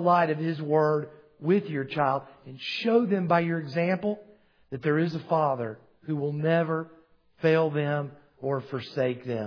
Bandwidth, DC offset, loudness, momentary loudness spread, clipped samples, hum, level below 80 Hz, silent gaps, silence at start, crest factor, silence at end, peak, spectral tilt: 5.4 kHz; under 0.1%; -27 LUFS; 13 LU; under 0.1%; none; -74 dBFS; none; 0 s; 18 dB; 0 s; -8 dBFS; -8.5 dB/octave